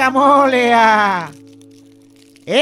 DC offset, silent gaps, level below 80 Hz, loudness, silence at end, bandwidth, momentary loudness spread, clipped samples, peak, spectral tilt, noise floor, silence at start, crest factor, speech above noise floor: under 0.1%; none; -64 dBFS; -12 LUFS; 0 s; 14.5 kHz; 10 LU; under 0.1%; 0 dBFS; -4 dB/octave; -46 dBFS; 0 s; 14 dB; 34 dB